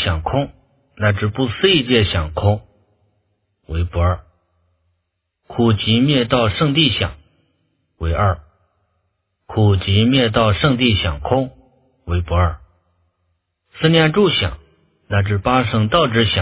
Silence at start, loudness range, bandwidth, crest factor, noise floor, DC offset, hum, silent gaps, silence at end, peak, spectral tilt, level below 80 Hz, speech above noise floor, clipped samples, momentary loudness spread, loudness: 0 s; 4 LU; 4 kHz; 18 dB; -73 dBFS; under 0.1%; none; none; 0 s; 0 dBFS; -10.5 dB/octave; -30 dBFS; 57 dB; under 0.1%; 11 LU; -17 LUFS